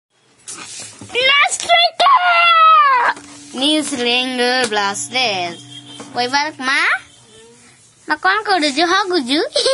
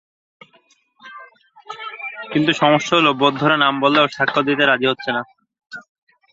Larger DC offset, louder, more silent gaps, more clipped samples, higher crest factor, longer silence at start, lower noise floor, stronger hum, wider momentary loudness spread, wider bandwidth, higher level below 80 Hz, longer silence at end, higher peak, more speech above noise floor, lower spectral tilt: neither; about the same, -14 LUFS vs -16 LUFS; neither; neither; about the same, 14 dB vs 18 dB; second, 0.45 s vs 1.05 s; second, -47 dBFS vs -57 dBFS; neither; second, 19 LU vs 23 LU; first, 11.5 kHz vs 7.8 kHz; about the same, -62 dBFS vs -62 dBFS; second, 0 s vs 0.5 s; about the same, -2 dBFS vs -2 dBFS; second, 30 dB vs 41 dB; second, -1 dB/octave vs -5 dB/octave